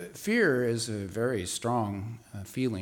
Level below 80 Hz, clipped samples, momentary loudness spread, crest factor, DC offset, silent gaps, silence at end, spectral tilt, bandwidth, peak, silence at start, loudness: -64 dBFS; under 0.1%; 14 LU; 16 dB; under 0.1%; none; 0 s; -5 dB/octave; 19 kHz; -14 dBFS; 0 s; -29 LUFS